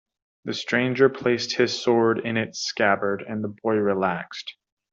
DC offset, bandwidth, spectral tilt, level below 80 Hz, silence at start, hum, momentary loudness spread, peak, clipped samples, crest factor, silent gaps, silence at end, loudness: under 0.1%; 7.6 kHz; -4.5 dB/octave; -68 dBFS; 0.45 s; none; 11 LU; -6 dBFS; under 0.1%; 18 dB; none; 0.4 s; -23 LUFS